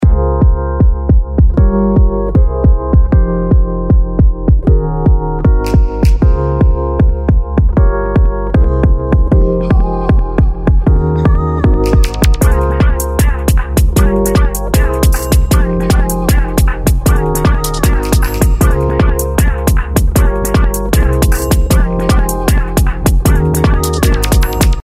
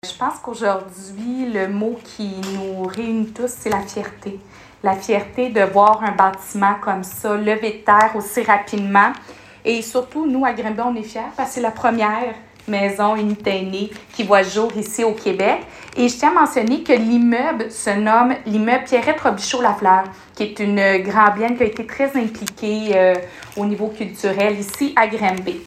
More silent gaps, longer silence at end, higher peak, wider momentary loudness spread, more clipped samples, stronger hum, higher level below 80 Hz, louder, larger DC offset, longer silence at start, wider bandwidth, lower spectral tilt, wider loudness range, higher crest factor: neither; about the same, 0.05 s vs 0 s; about the same, 0 dBFS vs 0 dBFS; second, 2 LU vs 12 LU; neither; neither; first, -12 dBFS vs -56 dBFS; first, -12 LUFS vs -18 LUFS; neither; about the same, 0 s vs 0.05 s; about the same, 16 kHz vs 15.5 kHz; first, -6.5 dB/octave vs -4.5 dB/octave; second, 1 LU vs 7 LU; second, 10 dB vs 18 dB